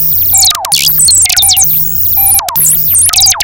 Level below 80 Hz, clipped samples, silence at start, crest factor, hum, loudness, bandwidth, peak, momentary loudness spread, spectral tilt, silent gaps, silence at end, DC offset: -34 dBFS; 0.2%; 0 s; 8 dB; none; -4 LUFS; over 20 kHz; 0 dBFS; 3 LU; 1 dB/octave; none; 0 s; under 0.1%